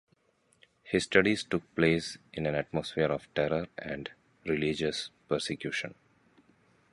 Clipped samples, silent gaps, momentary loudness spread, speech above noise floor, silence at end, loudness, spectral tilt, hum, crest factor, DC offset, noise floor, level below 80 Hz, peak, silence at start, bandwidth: under 0.1%; none; 13 LU; 39 dB; 1 s; -31 LUFS; -5 dB/octave; none; 24 dB; under 0.1%; -70 dBFS; -58 dBFS; -8 dBFS; 0.85 s; 11.5 kHz